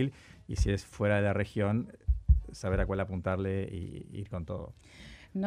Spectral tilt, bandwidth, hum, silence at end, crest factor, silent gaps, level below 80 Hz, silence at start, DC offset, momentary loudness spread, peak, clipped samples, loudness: -7.5 dB/octave; 11.5 kHz; none; 0 s; 20 dB; none; -36 dBFS; 0 s; under 0.1%; 14 LU; -12 dBFS; under 0.1%; -33 LUFS